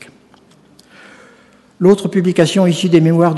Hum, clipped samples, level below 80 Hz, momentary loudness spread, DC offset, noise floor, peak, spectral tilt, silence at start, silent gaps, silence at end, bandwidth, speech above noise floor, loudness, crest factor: none; 0.1%; -58 dBFS; 3 LU; under 0.1%; -48 dBFS; 0 dBFS; -6.5 dB/octave; 1.8 s; none; 0 s; 12 kHz; 36 dB; -13 LUFS; 14 dB